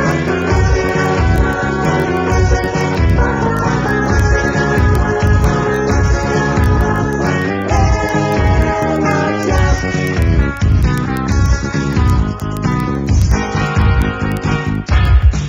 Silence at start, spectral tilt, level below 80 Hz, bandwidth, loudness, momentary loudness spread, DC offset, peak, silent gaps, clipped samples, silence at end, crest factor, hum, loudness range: 0 s; -6.5 dB/octave; -18 dBFS; 15 kHz; -14 LUFS; 3 LU; under 0.1%; 0 dBFS; none; under 0.1%; 0 s; 12 dB; none; 2 LU